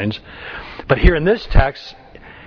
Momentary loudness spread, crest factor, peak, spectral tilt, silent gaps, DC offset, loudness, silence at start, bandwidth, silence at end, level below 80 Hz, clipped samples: 18 LU; 18 dB; 0 dBFS; -8 dB/octave; none; under 0.1%; -17 LUFS; 0 s; 5.4 kHz; 0.55 s; -20 dBFS; 0.2%